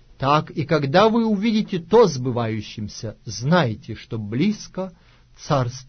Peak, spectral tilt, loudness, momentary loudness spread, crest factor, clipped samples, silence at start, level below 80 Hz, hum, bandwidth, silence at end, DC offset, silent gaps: -4 dBFS; -6 dB/octave; -21 LUFS; 16 LU; 16 dB; under 0.1%; 0.2 s; -50 dBFS; none; 6.6 kHz; 0.05 s; under 0.1%; none